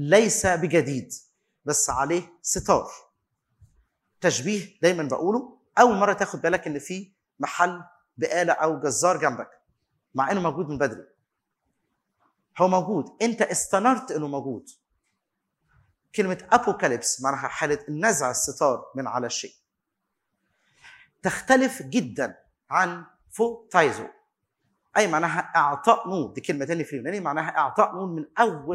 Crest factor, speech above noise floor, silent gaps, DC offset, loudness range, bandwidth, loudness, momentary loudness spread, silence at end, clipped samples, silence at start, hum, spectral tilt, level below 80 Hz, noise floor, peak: 24 dB; 57 dB; none; under 0.1%; 4 LU; 16 kHz; -24 LUFS; 12 LU; 0 s; under 0.1%; 0 s; none; -4 dB/octave; -60 dBFS; -81 dBFS; -2 dBFS